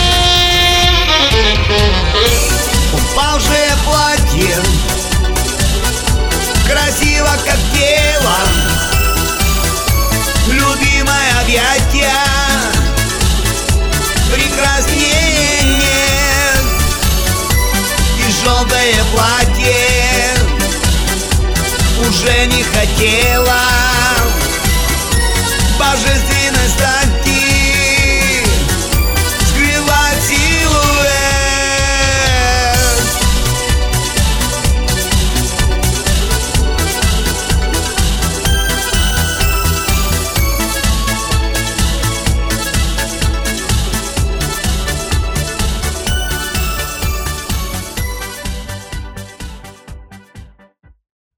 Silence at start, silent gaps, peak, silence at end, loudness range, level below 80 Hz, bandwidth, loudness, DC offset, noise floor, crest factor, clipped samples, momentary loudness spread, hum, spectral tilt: 0 s; none; 0 dBFS; 0.9 s; 6 LU; -16 dBFS; 18 kHz; -12 LUFS; under 0.1%; -47 dBFS; 12 dB; under 0.1%; 7 LU; none; -3 dB/octave